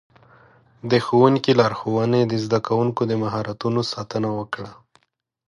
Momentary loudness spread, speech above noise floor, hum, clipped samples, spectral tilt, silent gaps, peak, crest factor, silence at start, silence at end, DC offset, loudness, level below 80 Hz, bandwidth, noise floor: 12 LU; 49 dB; none; under 0.1%; -7 dB/octave; none; -2 dBFS; 20 dB; 0.85 s; 0.75 s; under 0.1%; -21 LUFS; -58 dBFS; 11.5 kHz; -69 dBFS